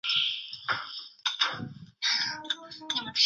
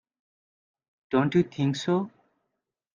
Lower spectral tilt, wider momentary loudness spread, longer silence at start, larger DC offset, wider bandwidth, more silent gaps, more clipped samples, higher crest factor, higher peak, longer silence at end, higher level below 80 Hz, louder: second, -1 dB/octave vs -7 dB/octave; first, 9 LU vs 5 LU; second, 0.05 s vs 1.1 s; neither; about the same, 8 kHz vs 7.4 kHz; neither; neither; about the same, 22 dB vs 20 dB; about the same, -10 dBFS vs -10 dBFS; second, 0 s vs 0.85 s; second, -72 dBFS vs -66 dBFS; second, -30 LUFS vs -26 LUFS